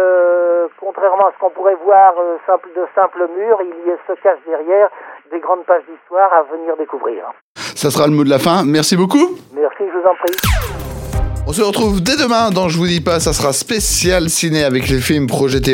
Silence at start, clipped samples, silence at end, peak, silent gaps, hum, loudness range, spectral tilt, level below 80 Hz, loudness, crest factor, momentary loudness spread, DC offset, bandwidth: 0 s; under 0.1%; 0 s; 0 dBFS; 7.41-7.55 s; none; 3 LU; -4.5 dB/octave; -30 dBFS; -14 LUFS; 14 dB; 9 LU; under 0.1%; 17.5 kHz